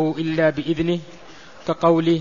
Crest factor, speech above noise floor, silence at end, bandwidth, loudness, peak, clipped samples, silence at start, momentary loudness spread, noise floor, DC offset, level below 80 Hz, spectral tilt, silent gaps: 18 dB; 24 dB; 0 s; 7.4 kHz; -21 LUFS; -4 dBFS; under 0.1%; 0 s; 10 LU; -44 dBFS; 0.6%; -50 dBFS; -7.5 dB/octave; none